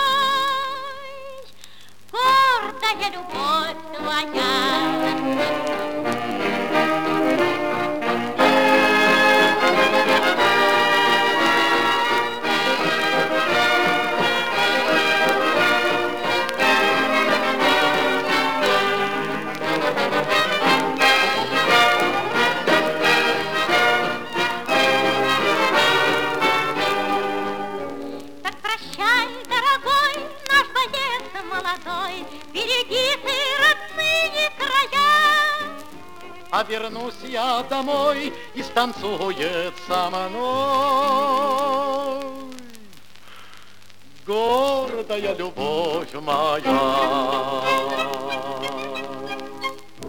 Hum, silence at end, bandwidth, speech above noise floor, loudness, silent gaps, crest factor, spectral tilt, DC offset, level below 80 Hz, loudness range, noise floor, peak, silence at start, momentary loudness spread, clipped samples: none; 0 s; over 20 kHz; 27 dB; -19 LUFS; none; 20 dB; -3 dB/octave; 1%; -58 dBFS; 7 LU; -50 dBFS; -2 dBFS; 0 s; 12 LU; under 0.1%